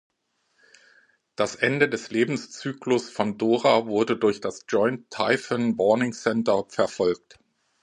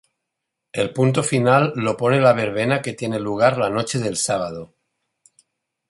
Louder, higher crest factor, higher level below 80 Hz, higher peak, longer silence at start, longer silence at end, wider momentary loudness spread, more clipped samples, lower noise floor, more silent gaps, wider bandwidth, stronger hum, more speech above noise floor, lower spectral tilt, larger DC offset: second, -24 LUFS vs -19 LUFS; about the same, 20 dB vs 18 dB; second, -66 dBFS vs -58 dBFS; second, -6 dBFS vs -2 dBFS; first, 1.4 s vs 0.75 s; second, 0.65 s vs 1.25 s; about the same, 7 LU vs 9 LU; neither; second, -71 dBFS vs -80 dBFS; neither; about the same, 10.5 kHz vs 11.5 kHz; neither; second, 47 dB vs 61 dB; about the same, -5 dB/octave vs -5 dB/octave; neither